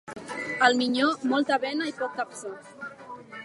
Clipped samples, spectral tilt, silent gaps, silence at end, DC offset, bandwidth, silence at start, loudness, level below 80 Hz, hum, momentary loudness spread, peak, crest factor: under 0.1%; -3 dB/octave; none; 0 s; under 0.1%; 11.5 kHz; 0.05 s; -26 LUFS; -74 dBFS; none; 19 LU; -6 dBFS; 22 dB